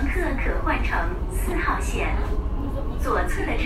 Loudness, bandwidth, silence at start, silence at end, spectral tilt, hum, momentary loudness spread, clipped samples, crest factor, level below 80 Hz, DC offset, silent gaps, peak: -26 LUFS; 13.5 kHz; 0 s; 0 s; -6 dB/octave; none; 4 LU; under 0.1%; 14 dB; -26 dBFS; under 0.1%; none; -8 dBFS